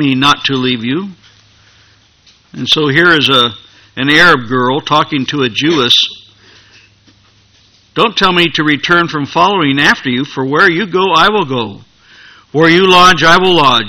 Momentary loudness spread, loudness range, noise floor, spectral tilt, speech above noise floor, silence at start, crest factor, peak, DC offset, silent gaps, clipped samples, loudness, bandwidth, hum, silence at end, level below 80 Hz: 11 LU; 4 LU; -48 dBFS; -4 dB/octave; 38 dB; 0 s; 12 dB; 0 dBFS; under 0.1%; none; 0.7%; -9 LUFS; 19.5 kHz; none; 0 s; -44 dBFS